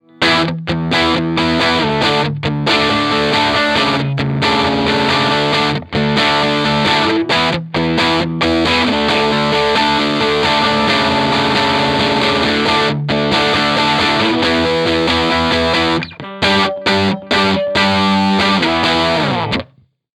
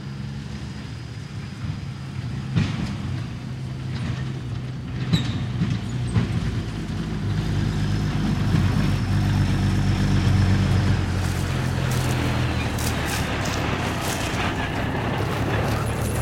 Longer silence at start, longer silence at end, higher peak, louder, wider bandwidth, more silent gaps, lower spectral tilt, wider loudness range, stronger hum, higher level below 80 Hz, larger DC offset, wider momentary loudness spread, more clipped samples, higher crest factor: first, 0.2 s vs 0 s; first, 0.5 s vs 0 s; first, 0 dBFS vs -6 dBFS; first, -13 LUFS vs -25 LUFS; second, 14 kHz vs 16.5 kHz; neither; about the same, -5 dB/octave vs -6 dB/octave; second, 1 LU vs 7 LU; neither; about the same, -38 dBFS vs -34 dBFS; neither; second, 4 LU vs 11 LU; neither; about the same, 14 dB vs 18 dB